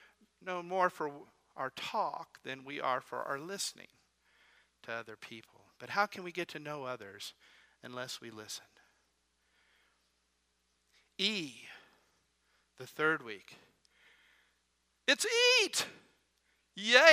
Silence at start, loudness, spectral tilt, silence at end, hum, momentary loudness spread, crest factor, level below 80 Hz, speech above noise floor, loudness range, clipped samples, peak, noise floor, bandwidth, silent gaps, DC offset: 0.45 s; -34 LUFS; -1.5 dB/octave; 0 s; none; 24 LU; 32 dB; -84 dBFS; 44 dB; 14 LU; under 0.1%; -4 dBFS; -78 dBFS; 15.5 kHz; none; under 0.1%